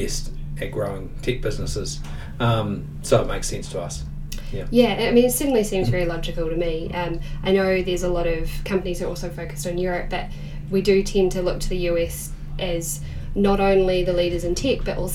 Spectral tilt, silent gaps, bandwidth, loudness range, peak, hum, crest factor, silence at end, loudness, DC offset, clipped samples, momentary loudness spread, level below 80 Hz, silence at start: -5 dB/octave; none; 17 kHz; 4 LU; -4 dBFS; none; 18 dB; 0 s; -23 LUFS; under 0.1%; under 0.1%; 12 LU; -30 dBFS; 0 s